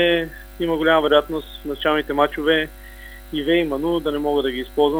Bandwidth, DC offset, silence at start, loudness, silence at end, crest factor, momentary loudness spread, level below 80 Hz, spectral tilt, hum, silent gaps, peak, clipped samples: over 20 kHz; under 0.1%; 0 s; -20 LUFS; 0 s; 18 dB; 13 LU; -40 dBFS; -5.5 dB/octave; 50 Hz at -40 dBFS; none; -2 dBFS; under 0.1%